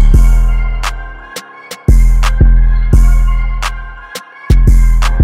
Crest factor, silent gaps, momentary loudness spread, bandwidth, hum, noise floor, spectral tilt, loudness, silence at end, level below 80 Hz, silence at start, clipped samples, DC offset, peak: 8 dB; none; 17 LU; 11.5 kHz; none; -30 dBFS; -6 dB/octave; -12 LUFS; 0 s; -8 dBFS; 0 s; under 0.1%; under 0.1%; 0 dBFS